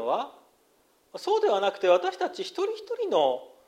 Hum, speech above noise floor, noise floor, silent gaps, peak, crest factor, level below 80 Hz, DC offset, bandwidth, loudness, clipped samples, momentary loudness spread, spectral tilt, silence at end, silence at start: none; 39 dB; -65 dBFS; none; -10 dBFS; 18 dB; -80 dBFS; under 0.1%; 13 kHz; -27 LUFS; under 0.1%; 10 LU; -3.5 dB/octave; 0.2 s; 0 s